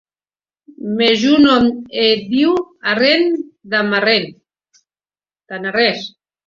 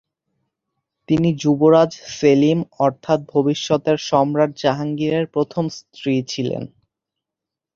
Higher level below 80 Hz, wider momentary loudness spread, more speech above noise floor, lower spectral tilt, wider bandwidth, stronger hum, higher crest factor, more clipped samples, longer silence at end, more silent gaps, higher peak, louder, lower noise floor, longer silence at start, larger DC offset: about the same, -56 dBFS vs -58 dBFS; first, 14 LU vs 10 LU; first, over 75 dB vs 68 dB; second, -5 dB/octave vs -6.5 dB/octave; about the same, 7.4 kHz vs 7.6 kHz; neither; about the same, 16 dB vs 18 dB; neither; second, 0.4 s vs 1.1 s; neither; about the same, 0 dBFS vs -2 dBFS; first, -15 LUFS vs -19 LUFS; first, under -90 dBFS vs -85 dBFS; second, 0.8 s vs 1.1 s; neither